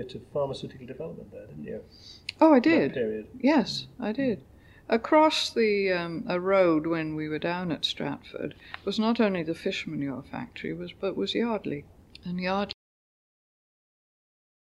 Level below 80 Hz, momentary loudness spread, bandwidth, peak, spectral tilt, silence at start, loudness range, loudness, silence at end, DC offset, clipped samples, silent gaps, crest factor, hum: -60 dBFS; 18 LU; 12 kHz; -8 dBFS; -5.5 dB/octave; 0 s; 7 LU; -27 LUFS; 2 s; under 0.1%; under 0.1%; none; 20 dB; none